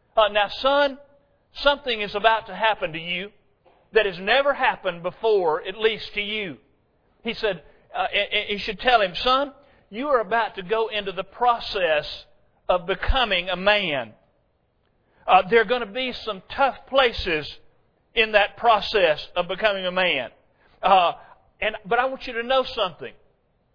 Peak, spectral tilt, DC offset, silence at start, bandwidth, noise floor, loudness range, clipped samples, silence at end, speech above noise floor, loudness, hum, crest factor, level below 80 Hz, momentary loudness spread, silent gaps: -2 dBFS; -5 dB/octave; under 0.1%; 0.15 s; 5.4 kHz; -67 dBFS; 3 LU; under 0.1%; 0.65 s; 44 dB; -22 LUFS; none; 22 dB; -42 dBFS; 12 LU; none